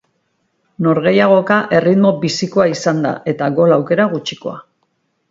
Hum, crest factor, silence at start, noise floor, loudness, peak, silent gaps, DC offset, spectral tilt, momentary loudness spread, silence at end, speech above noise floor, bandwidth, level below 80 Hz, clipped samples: none; 16 dB; 0.8 s; -66 dBFS; -14 LUFS; 0 dBFS; none; under 0.1%; -6 dB/octave; 11 LU; 0.7 s; 52 dB; 7.8 kHz; -58 dBFS; under 0.1%